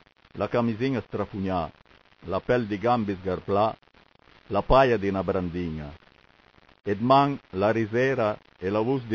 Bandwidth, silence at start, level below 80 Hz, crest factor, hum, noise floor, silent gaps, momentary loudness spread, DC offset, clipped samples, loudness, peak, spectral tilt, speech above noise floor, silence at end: 7.2 kHz; 0.35 s; -44 dBFS; 20 dB; none; -58 dBFS; none; 13 LU; under 0.1%; under 0.1%; -26 LUFS; -6 dBFS; -8 dB/octave; 33 dB; 0 s